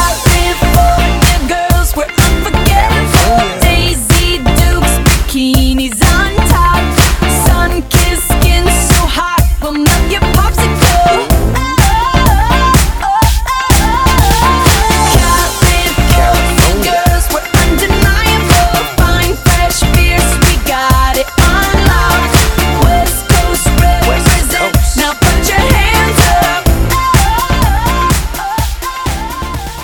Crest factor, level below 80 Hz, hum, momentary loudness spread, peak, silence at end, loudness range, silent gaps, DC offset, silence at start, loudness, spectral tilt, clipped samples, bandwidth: 8 dB; -12 dBFS; none; 3 LU; 0 dBFS; 0 s; 1 LU; none; under 0.1%; 0 s; -10 LUFS; -4 dB/octave; 0.3%; over 20 kHz